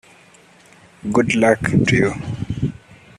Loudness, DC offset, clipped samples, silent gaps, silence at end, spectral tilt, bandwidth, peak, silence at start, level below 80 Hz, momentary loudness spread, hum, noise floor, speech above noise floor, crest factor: -18 LUFS; under 0.1%; under 0.1%; none; 0.45 s; -6 dB/octave; 12 kHz; -2 dBFS; 1.05 s; -44 dBFS; 11 LU; none; -49 dBFS; 32 dB; 18 dB